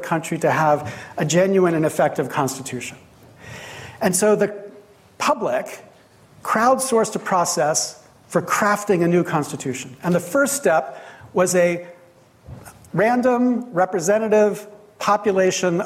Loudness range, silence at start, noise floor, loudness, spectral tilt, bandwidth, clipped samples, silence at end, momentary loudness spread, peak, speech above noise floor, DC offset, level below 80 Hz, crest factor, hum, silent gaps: 4 LU; 0 s; -51 dBFS; -20 LUFS; -4.5 dB/octave; 16 kHz; under 0.1%; 0 s; 16 LU; -6 dBFS; 32 dB; under 0.1%; -60 dBFS; 14 dB; none; none